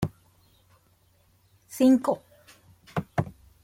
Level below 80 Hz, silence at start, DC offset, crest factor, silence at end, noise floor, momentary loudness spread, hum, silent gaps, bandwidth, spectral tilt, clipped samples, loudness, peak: -58 dBFS; 0 s; under 0.1%; 20 dB; 0.35 s; -64 dBFS; 16 LU; none; none; 16.5 kHz; -7 dB/octave; under 0.1%; -26 LUFS; -10 dBFS